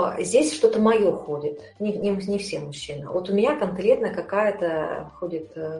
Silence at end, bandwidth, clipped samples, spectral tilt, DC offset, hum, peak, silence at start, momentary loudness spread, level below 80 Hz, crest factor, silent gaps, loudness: 0 s; 11.5 kHz; under 0.1%; -5 dB/octave; under 0.1%; none; -6 dBFS; 0 s; 13 LU; -56 dBFS; 18 dB; none; -24 LUFS